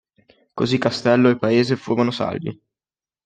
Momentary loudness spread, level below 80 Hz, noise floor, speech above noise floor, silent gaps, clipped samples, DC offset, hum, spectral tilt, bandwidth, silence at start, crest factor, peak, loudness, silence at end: 13 LU; -60 dBFS; under -90 dBFS; over 71 dB; none; under 0.1%; under 0.1%; none; -6.5 dB/octave; 9.2 kHz; 0.55 s; 18 dB; -4 dBFS; -19 LUFS; 0.7 s